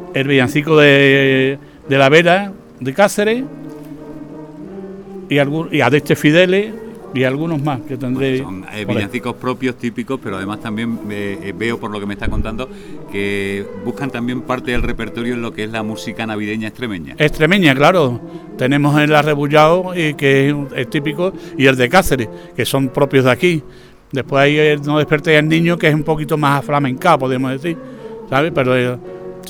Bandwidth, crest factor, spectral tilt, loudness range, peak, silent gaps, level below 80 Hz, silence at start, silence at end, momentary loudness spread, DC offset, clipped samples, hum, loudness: 19 kHz; 16 dB; -6 dB/octave; 9 LU; 0 dBFS; none; -36 dBFS; 0 s; 0 s; 16 LU; under 0.1%; under 0.1%; none; -15 LUFS